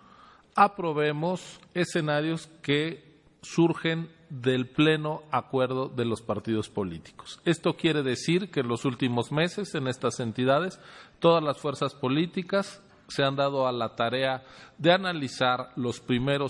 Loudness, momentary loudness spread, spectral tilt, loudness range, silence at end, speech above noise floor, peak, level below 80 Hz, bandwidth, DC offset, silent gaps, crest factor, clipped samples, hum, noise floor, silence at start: -27 LUFS; 10 LU; -5.5 dB/octave; 1 LU; 0 s; 28 dB; -6 dBFS; -64 dBFS; 11.5 kHz; under 0.1%; none; 22 dB; under 0.1%; none; -55 dBFS; 0.55 s